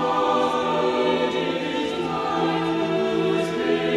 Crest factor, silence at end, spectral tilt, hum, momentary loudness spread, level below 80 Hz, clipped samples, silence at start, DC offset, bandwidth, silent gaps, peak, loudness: 14 dB; 0 s; -5.5 dB/octave; none; 4 LU; -56 dBFS; under 0.1%; 0 s; under 0.1%; 13 kHz; none; -10 dBFS; -23 LUFS